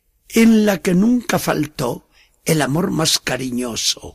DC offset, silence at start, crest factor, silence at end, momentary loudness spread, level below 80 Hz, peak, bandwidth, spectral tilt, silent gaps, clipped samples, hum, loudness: under 0.1%; 0.3 s; 14 dB; 0.05 s; 10 LU; -46 dBFS; -4 dBFS; 15.5 kHz; -4.5 dB/octave; none; under 0.1%; none; -17 LUFS